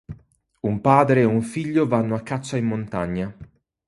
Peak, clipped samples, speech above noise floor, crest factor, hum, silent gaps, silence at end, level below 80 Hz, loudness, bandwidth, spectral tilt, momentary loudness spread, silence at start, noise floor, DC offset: -2 dBFS; under 0.1%; 33 dB; 20 dB; none; none; 0.45 s; -50 dBFS; -21 LUFS; 11.5 kHz; -7.5 dB/octave; 13 LU; 0.1 s; -54 dBFS; under 0.1%